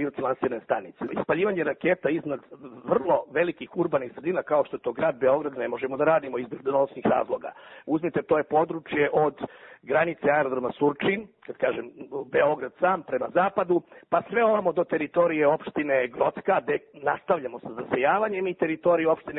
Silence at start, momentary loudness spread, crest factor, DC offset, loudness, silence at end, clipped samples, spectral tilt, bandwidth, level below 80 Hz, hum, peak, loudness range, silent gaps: 0 s; 9 LU; 16 dB; under 0.1%; -26 LUFS; 0 s; under 0.1%; -10.5 dB/octave; 4 kHz; -66 dBFS; none; -8 dBFS; 2 LU; none